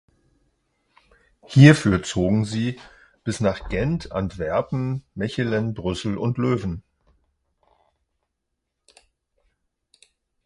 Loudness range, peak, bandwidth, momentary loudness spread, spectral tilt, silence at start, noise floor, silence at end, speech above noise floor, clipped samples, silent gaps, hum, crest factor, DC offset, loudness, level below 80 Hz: 10 LU; 0 dBFS; 11.5 kHz; 15 LU; -6.5 dB/octave; 1.5 s; -79 dBFS; 3.65 s; 59 dB; under 0.1%; none; none; 24 dB; under 0.1%; -22 LUFS; -44 dBFS